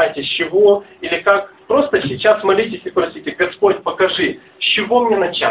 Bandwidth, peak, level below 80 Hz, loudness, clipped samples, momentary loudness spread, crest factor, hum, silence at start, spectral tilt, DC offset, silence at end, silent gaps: 4 kHz; 0 dBFS; -52 dBFS; -16 LUFS; under 0.1%; 7 LU; 16 dB; none; 0 s; -8 dB/octave; under 0.1%; 0 s; none